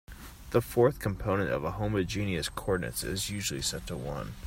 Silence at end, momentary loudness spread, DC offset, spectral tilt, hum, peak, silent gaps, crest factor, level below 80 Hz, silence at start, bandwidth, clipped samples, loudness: 0 s; 10 LU; under 0.1%; -4.5 dB/octave; none; -12 dBFS; none; 20 dB; -46 dBFS; 0.1 s; 16.5 kHz; under 0.1%; -31 LUFS